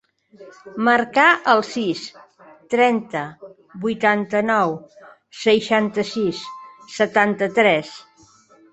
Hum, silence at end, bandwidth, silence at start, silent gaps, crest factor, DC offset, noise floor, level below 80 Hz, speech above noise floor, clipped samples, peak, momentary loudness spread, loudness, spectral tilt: none; 0.7 s; 8.2 kHz; 0.4 s; none; 20 dB; under 0.1%; -52 dBFS; -64 dBFS; 33 dB; under 0.1%; -2 dBFS; 18 LU; -19 LUFS; -4.5 dB/octave